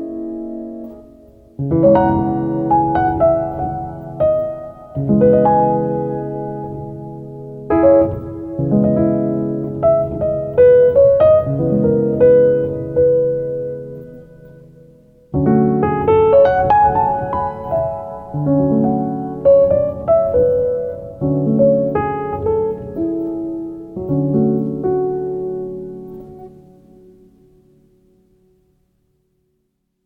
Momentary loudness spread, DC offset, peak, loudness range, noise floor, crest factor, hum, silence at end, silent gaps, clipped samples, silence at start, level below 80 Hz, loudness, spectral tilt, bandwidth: 16 LU; under 0.1%; -2 dBFS; 7 LU; -69 dBFS; 14 dB; none; 3.55 s; none; under 0.1%; 0 s; -40 dBFS; -16 LUFS; -11.5 dB/octave; 4 kHz